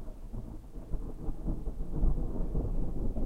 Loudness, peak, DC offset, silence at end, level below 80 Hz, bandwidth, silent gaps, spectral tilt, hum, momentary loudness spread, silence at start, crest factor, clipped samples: -39 LUFS; -16 dBFS; under 0.1%; 0 s; -34 dBFS; 1.8 kHz; none; -10 dB/octave; none; 11 LU; 0 s; 14 dB; under 0.1%